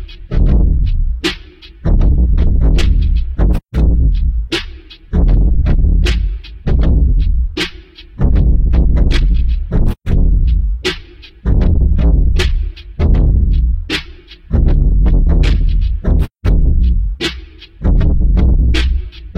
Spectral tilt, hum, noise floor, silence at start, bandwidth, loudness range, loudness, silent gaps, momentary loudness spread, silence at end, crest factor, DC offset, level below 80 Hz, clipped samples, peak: -7 dB/octave; none; -34 dBFS; 0 s; 8.2 kHz; 1 LU; -15 LUFS; none; 7 LU; 0.1 s; 12 dB; under 0.1%; -12 dBFS; under 0.1%; 0 dBFS